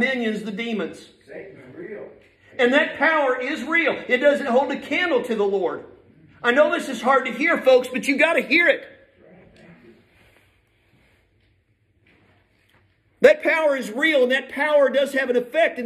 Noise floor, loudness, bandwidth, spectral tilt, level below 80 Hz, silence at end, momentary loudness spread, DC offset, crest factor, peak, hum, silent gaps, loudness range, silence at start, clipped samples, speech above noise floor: -64 dBFS; -20 LUFS; 14 kHz; -4 dB/octave; -68 dBFS; 0 s; 19 LU; under 0.1%; 20 dB; -2 dBFS; none; none; 5 LU; 0 s; under 0.1%; 44 dB